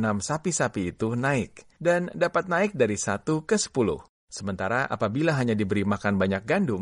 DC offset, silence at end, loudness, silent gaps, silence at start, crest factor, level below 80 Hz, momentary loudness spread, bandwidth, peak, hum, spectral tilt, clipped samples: under 0.1%; 0 s; -26 LUFS; 4.09-4.27 s; 0 s; 16 dB; -56 dBFS; 5 LU; 11.5 kHz; -10 dBFS; none; -5 dB/octave; under 0.1%